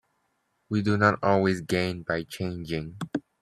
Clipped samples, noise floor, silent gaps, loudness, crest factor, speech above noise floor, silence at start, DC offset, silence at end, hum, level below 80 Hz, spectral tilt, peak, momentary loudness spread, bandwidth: under 0.1%; -74 dBFS; none; -27 LUFS; 22 dB; 48 dB; 0.7 s; under 0.1%; 0.2 s; none; -58 dBFS; -6.5 dB/octave; -6 dBFS; 11 LU; 14.5 kHz